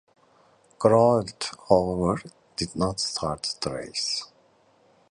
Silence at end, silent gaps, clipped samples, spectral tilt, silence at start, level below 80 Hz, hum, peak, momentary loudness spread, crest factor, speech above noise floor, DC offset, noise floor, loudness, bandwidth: 0.85 s; none; under 0.1%; -5 dB/octave; 0.8 s; -50 dBFS; none; -4 dBFS; 13 LU; 22 dB; 37 dB; under 0.1%; -61 dBFS; -25 LUFS; 11 kHz